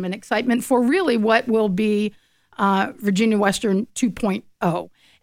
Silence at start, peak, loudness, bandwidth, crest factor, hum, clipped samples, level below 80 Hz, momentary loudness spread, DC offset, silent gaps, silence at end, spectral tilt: 0 s; -4 dBFS; -20 LUFS; 16 kHz; 16 dB; none; under 0.1%; -54 dBFS; 7 LU; under 0.1%; none; 0.35 s; -5.5 dB/octave